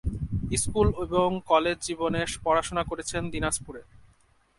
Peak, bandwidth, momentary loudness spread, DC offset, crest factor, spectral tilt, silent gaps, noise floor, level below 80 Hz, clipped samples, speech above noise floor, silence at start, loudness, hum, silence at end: -8 dBFS; 12 kHz; 8 LU; under 0.1%; 20 dB; -4.5 dB/octave; none; -63 dBFS; -40 dBFS; under 0.1%; 36 dB; 0.05 s; -27 LUFS; none; 0.6 s